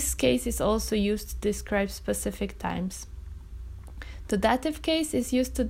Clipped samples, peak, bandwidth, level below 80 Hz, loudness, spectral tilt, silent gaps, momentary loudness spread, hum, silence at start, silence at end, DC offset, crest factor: under 0.1%; -10 dBFS; 16 kHz; -40 dBFS; -28 LUFS; -4.5 dB/octave; none; 18 LU; none; 0 s; 0 s; under 0.1%; 18 dB